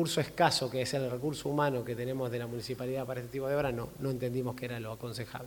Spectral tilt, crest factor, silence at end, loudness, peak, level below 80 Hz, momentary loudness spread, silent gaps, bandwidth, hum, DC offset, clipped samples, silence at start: -5 dB/octave; 20 dB; 0 s; -34 LUFS; -14 dBFS; -60 dBFS; 11 LU; none; 19 kHz; none; under 0.1%; under 0.1%; 0 s